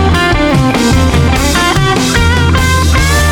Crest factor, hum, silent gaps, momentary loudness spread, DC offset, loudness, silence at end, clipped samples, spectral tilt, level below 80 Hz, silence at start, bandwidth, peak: 8 dB; none; none; 1 LU; under 0.1%; -9 LUFS; 0 s; under 0.1%; -4.5 dB/octave; -16 dBFS; 0 s; 17.5 kHz; 0 dBFS